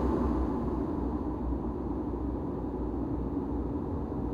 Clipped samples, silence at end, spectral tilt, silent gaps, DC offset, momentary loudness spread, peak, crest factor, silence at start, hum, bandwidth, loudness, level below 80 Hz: under 0.1%; 0 s; -10.5 dB/octave; none; under 0.1%; 4 LU; -18 dBFS; 14 dB; 0 s; none; 5 kHz; -33 LUFS; -38 dBFS